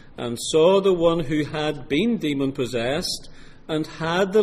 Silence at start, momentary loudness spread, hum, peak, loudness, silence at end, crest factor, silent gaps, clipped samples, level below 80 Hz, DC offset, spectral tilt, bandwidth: 0.05 s; 11 LU; none; -6 dBFS; -22 LUFS; 0 s; 16 dB; none; under 0.1%; -44 dBFS; under 0.1%; -5 dB/octave; 15.5 kHz